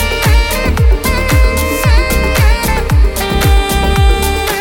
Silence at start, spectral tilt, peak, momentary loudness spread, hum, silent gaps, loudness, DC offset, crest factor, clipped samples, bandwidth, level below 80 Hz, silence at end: 0 s; -4.5 dB/octave; 0 dBFS; 2 LU; none; none; -12 LUFS; under 0.1%; 10 dB; under 0.1%; 17.5 kHz; -12 dBFS; 0 s